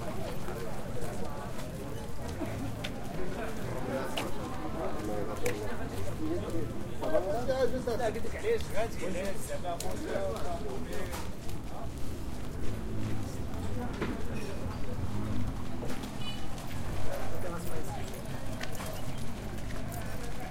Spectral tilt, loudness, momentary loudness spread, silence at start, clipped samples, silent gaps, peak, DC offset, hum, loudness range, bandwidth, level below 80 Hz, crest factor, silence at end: -5.5 dB/octave; -37 LUFS; 8 LU; 0 s; under 0.1%; none; -14 dBFS; under 0.1%; none; 6 LU; 16.5 kHz; -44 dBFS; 16 dB; 0 s